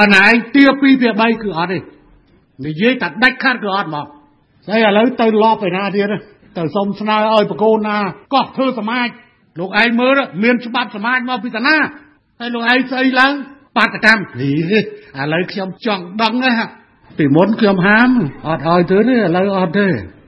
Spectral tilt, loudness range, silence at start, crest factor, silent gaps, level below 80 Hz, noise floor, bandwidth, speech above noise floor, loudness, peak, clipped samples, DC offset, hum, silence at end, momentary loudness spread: -6.5 dB/octave; 3 LU; 0 s; 14 dB; none; -52 dBFS; -50 dBFS; 11 kHz; 36 dB; -14 LUFS; 0 dBFS; under 0.1%; under 0.1%; none; 0.15 s; 11 LU